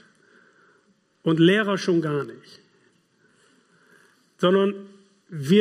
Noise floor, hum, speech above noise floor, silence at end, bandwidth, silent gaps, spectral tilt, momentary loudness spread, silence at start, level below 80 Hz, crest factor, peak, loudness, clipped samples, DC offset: -64 dBFS; none; 43 dB; 0 s; 14 kHz; none; -6.5 dB/octave; 18 LU; 1.25 s; -74 dBFS; 20 dB; -6 dBFS; -22 LUFS; under 0.1%; under 0.1%